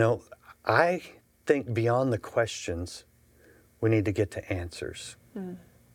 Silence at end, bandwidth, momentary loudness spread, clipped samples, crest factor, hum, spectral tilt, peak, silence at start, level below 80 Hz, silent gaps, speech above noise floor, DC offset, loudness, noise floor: 0.35 s; 16 kHz; 16 LU; under 0.1%; 24 dB; none; -6 dB/octave; -6 dBFS; 0 s; -60 dBFS; none; 31 dB; under 0.1%; -28 LUFS; -59 dBFS